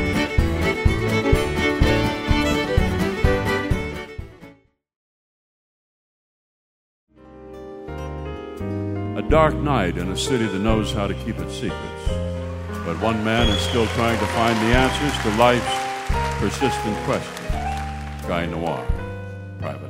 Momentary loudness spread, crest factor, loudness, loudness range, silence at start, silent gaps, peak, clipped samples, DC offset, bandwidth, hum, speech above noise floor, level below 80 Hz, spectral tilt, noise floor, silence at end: 14 LU; 22 dB; -22 LUFS; 13 LU; 0 s; 4.96-7.07 s; -2 dBFS; under 0.1%; under 0.1%; 16 kHz; none; 30 dB; -30 dBFS; -5.5 dB/octave; -51 dBFS; 0 s